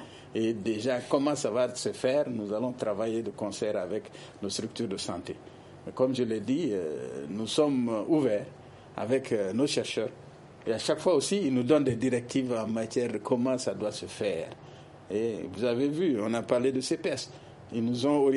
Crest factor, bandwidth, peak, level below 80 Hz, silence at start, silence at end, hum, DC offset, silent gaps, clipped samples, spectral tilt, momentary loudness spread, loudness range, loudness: 18 dB; 11.5 kHz; -10 dBFS; -68 dBFS; 0 s; 0 s; none; under 0.1%; none; under 0.1%; -5 dB/octave; 12 LU; 4 LU; -30 LUFS